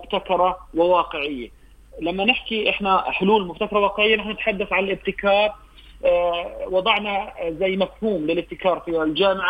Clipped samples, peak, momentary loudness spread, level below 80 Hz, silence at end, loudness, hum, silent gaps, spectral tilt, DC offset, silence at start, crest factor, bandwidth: under 0.1%; -2 dBFS; 7 LU; -46 dBFS; 0 s; -21 LUFS; none; none; -6.5 dB/octave; under 0.1%; 0 s; 18 dB; 8.8 kHz